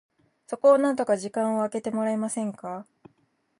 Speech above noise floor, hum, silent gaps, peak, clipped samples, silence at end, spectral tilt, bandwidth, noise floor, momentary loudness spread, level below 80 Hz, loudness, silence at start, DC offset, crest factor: 45 dB; none; none; -8 dBFS; under 0.1%; 0.75 s; -5.5 dB/octave; 11.5 kHz; -69 dBFS; 17 LU; -76 dBFS; -25 LUFS; 0.5 s; under 0.1%; 18 dB